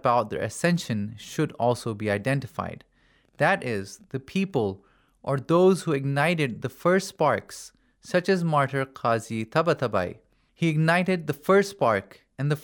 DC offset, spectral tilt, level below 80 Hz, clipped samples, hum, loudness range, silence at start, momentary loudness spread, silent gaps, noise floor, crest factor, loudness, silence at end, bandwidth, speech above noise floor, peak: under 0.1%; -6 dB/octave; -64 dBFS; under 0.1%; none; 4 LU; 0.05 s; 12 LU; none; -63 dBFS; 18 dB; -25 LUFS; 0 s; 19 kHz; 38 dB; -8 dBFS